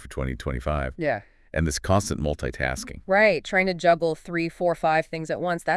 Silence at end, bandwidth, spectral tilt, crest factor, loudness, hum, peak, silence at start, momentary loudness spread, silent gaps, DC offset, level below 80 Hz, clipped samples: 0 s; 12 kHz; -5 dB/octave; 18 dB; -25 LUFS; none; -6 dBFS; 0 s; 10 LU; none; under 0.1%; -40 dBFS; under 0.1%